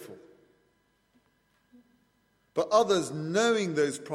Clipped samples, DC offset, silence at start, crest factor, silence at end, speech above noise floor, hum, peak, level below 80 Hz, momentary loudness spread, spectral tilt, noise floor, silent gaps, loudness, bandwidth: under 0.1%; under 0.1%; 0 s; 22 dB; 0 s; 44 dB; 50 Hz at -70 dBFS; -8 dBFS; -74 dBFS; 10 LU; -4.5 dB/octave; -71 dBFS; none; -27 LUFS; 14.5 kHz